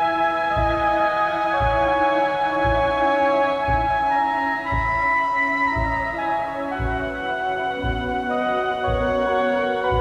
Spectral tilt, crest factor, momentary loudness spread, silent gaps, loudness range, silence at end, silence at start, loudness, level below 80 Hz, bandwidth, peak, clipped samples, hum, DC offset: -6.5 dB/octave; 12 dB; 6 LU; none; 4 LU; 0 s; 0 s; -21 LUFS; -34 dBFS; 11 kHz; -8 dBFS; under 0.1%; none; under 0.1%